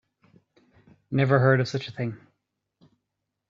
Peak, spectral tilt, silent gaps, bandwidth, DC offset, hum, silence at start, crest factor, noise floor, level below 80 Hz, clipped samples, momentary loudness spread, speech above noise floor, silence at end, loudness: -6 dBFS; -7.5 dB/octave; none; 7.4 kHz; under 0.1%; none; 1.1 s; 22 dB; -82 dBFS; -66 dBFS; under 0.1%; 14 LU; 59 dB; 1.35 s; -24 LUFS